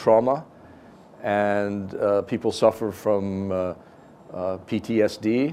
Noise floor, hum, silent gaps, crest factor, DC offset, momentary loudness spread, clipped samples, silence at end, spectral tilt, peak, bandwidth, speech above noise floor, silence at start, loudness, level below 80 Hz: -48 dBFS; none; none; 18 dB; under 0.1%; 10 LU; under 0.1%; 0 s; -6.5 dB/octave; -6 dBFS; 15.5 kHz; 25 dB; 0 s; -24 LUFS; -62 dBFS